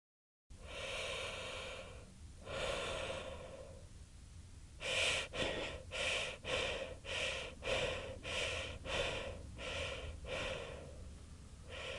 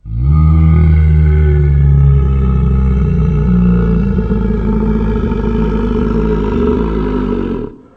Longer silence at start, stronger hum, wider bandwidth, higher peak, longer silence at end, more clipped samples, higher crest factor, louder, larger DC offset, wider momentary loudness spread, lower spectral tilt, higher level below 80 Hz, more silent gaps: first, 0.5 s vs 0.05 s; neither; first, 11.5 kHz vs 4.1 kHz; second, -24 dBFS vs 0 dBFS; second, 0 s vs 0.2 s; neither; first, 20 dB vs 10 dB; second, -41 LUFS vs -12 LUFS; neither; first, 18 LU vs 6 LU; second, -2.5 dB/octave vs -11 dB/octave; second, -56 dBFS vs -14 dBFS; neither